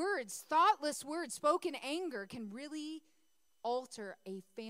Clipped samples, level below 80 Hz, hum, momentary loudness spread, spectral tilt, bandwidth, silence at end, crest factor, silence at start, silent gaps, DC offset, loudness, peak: under 0.1%; -86 dBFS; none; 17 LU; -3 dB/octave; 16 kHz; 0 s; 20 dB; 0 s; none; under 0.1%; -37 LUFS; -18 dBFS